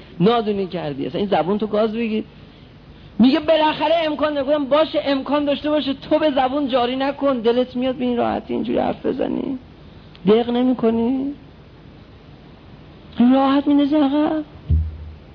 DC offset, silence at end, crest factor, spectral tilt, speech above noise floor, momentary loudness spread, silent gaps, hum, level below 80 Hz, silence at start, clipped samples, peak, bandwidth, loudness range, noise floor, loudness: under 0.1%; 0.1 s; 16 dB; -9 dB/octave; 25 dB; 9 LU; none; none; -38 dBFS; 0 s; under 0.1%; -4 dBFS; 5.4 kHz; 3 LU; -43 dBFS; -19 LUFS